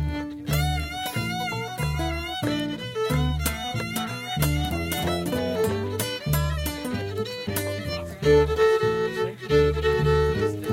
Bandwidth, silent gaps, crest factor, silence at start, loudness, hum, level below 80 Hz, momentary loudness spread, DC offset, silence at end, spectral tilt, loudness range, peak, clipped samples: 16.5 kHz; none; 18 dB; 0 s; -25 LUFS; none; -34 dBFS; 9 LU; under 0.1%; 0 s; -5.5 dB/octave; 4 LU; -8 dBFS; under 0.1%